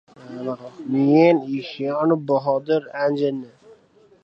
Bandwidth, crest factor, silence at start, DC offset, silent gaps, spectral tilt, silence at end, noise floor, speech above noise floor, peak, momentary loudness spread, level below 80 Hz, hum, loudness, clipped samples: 6.2 kHz; 18 dB; 0.2 s; under 0.1%; none; -8.5 dB/octave; 0.5 s; -54 dBFS; 34 dB; -4 dBFS; 16 LU; -72 dBFS; none; -21 LUFS; under 0.1%